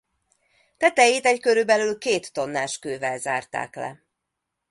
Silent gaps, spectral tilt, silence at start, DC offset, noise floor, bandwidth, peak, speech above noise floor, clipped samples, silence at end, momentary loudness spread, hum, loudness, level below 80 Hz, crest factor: none; -2.5 dB/octave; 0.8 s; under 0.1%; -82 dBFS; 11.5 kHz; -2 dBFS; 59 dB; under 0.1%; 0.75 s; 14 LU; none; -22 LUFS; -70 dBFS; 22 dB